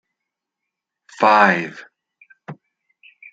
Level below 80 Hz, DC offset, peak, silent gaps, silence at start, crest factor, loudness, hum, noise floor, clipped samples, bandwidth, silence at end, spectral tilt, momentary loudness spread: -72 dBFS; under 0.1%; -2 dBFS; none; 1.2 s; 20 dB; -15 LUFS; none; -82 dBFS; under 0.1%; 9 kHz; 0.8 s; -5.5 dB/octave; 27 LU